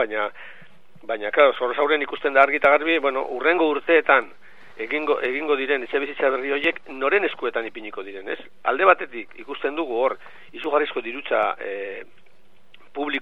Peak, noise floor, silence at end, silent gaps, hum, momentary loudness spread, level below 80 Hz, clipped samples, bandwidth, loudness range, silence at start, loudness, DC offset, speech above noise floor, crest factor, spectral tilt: 0 dBFS; -60 dBFS; 0 s; none; none; 17 LU; -68 dBFS; under 0.1%; 5.8 kHz; 7 LU; 0 s; -22 LUFS; 0.9%; 38 dB; 22 dB; -5 dB/octave